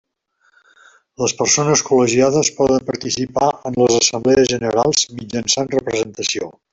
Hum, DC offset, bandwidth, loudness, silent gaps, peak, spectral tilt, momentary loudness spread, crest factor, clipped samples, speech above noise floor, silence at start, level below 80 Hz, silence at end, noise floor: none; under 0.1%; 8.2 kHz; -16 LUFS; none; -2 dBFS; -3.5 dB/octave; 8 LU; 16 dB; under 0.1%; 45 dB; 1.2 s; -52 dBFS; 0.2 s; -62 dBFS